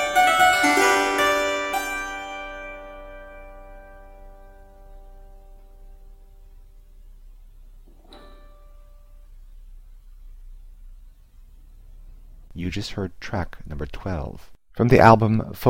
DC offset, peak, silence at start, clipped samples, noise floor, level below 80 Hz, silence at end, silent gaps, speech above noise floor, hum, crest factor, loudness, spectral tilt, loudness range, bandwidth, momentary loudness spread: under 0.1%; 0 dBFS; 0 s; under 0.1%; -47 dBFS; -42 dBFS; 0 s; none; 27 dB; none; 24 dB; -20 LUFS; -5 dB/octave; 26 LU; 16.5 kHz; 27 LU